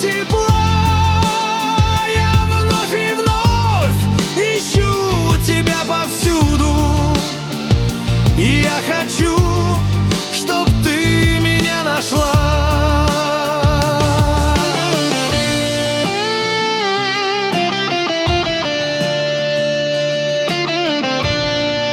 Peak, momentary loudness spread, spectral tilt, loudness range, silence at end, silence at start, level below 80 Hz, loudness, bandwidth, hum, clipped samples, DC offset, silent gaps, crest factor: 0 dBFS; 3 LU; -5 dB/octave; 2 LU; 0 s; 0 s; -26 dBFS; -16 LUFS; 18 kHz; none; under 0.1%; under 0.1%; none; 14 dB